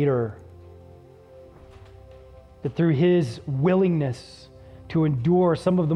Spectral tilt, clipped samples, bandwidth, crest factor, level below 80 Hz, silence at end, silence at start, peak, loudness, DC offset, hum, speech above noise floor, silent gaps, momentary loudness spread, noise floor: -9 dB/octave; under 0.1%; 10 kHz; 14 dB; -52 dBFS; 0 s; 0 s; -10 dBFS; -23 LUFS; under 0.1%; none; 26 dB; none; 13 LU; -48 dBFS